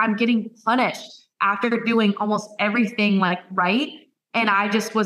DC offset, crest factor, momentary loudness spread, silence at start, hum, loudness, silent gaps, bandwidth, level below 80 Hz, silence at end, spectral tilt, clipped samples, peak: under 0.1%; 14 dB; 5 LU; 0 s; none; -21 LUFS; none; 13.5 kHz; -78 dBFS; 0 s; -5.5 dB/octave; under 0.1%; -6 dBFS